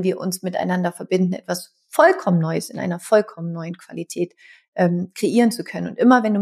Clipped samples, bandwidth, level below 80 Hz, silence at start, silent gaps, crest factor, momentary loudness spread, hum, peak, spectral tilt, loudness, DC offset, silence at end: under 0.1%; 15 kHz; -72 dBFS; 0 s; 4.68-4.73 s; 18 dB; 13 LU; none; -2 dBFS; -6 dB/octave; -20 LUFS; under 0.1%; 0 s